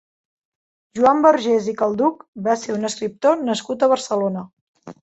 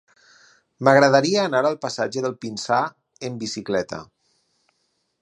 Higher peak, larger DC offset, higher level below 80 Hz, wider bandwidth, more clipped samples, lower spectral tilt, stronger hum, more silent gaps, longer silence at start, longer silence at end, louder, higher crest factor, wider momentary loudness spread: about the same, -2 dBFS vs 0 dBFS; neither; about the same, -64 dBFS vs -64 dBFS; second, 8.2 kHz vs 11 kHz; neither; about the same, -5 dB/octave vs -4.5 dB/octave; neither; first, 2.28-2.33 s, 4.53-4.74 s vs none; first, 0.95 s vs 0.8 s; second, 0.1 s vs 1.2 s; about the same, -19 LUFS vs -21 LUFS; about the same, 18 dB vs 22 dB; second, 10 LU vs 17 LU